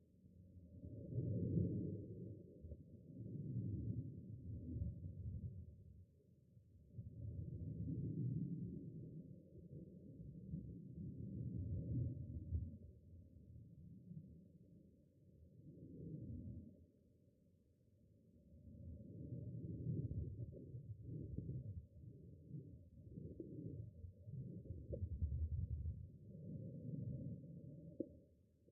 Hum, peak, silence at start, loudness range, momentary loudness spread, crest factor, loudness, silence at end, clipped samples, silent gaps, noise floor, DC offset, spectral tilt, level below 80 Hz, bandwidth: none; -28 dBFS; 0 s; 11 LU; 18 LU; 22 dB; -50 LUFS; 0 s; under 0.1%; none; -74 dBFS; under 0.1%; -10 dB/octave; -60 dBFS; 0.7 kHz